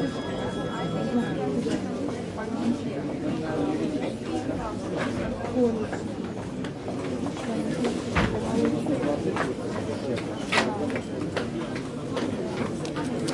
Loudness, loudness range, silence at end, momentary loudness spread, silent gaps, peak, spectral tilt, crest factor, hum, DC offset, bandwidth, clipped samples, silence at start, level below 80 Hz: -29 LUFS; 3 LU; 0 s; 6 LU; none; -8 dBFS; -6 dB/octave; 20 dB; none; under 0.1%; 11.5 kHz; under 0.1%; 0 s; -48 dBFS